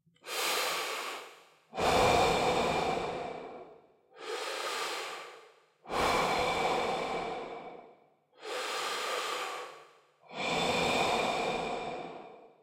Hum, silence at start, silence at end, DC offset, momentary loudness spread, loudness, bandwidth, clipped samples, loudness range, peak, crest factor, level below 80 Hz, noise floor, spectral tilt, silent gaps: none; 0.25 s; 0.15 s; under 0.1%; 19 LU; -32 LUFS; 16.5 kHz; under 0.1%; 7 LU; -14 dBFS; 20 dB; -56 dBFS; -63 dBFS; -3 dB/octave; none